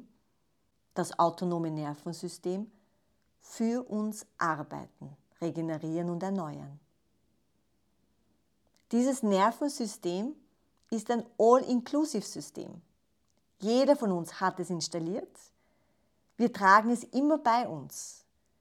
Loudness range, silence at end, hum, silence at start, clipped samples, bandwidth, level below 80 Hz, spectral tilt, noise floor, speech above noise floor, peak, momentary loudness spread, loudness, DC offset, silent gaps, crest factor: 8 LU; 0.45 s; none; 0.95 s; under 0.1%; 15 kHz; -78 dBFS; -5 dB/octave; -76 dBFS; 47 dB; -8 dBFS; 18 LU; -30 LUFS; under 0.1%; none; 24 dB